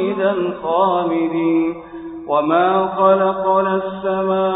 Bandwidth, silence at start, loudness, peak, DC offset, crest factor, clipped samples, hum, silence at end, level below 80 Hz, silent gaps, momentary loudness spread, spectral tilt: 4 kHz; 0 s; -17 LUFS; -2 dBFS; under 0.1%; 14 dB; under 0.1%; none; 0 s; -56 dBFS; none; 7 LU; -11.5 dB/octave